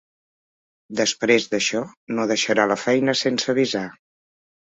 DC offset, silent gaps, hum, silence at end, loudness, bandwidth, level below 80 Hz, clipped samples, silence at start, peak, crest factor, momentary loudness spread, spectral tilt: under 0.1%; 1.97-2.07 s; none; 0.75 s; -21 LUFS; 8.2 kHz; -66 dBFS; under 0.1%; 0.9 s; -2 dBFS; 20 dB; 10 LU; -3 dB/octave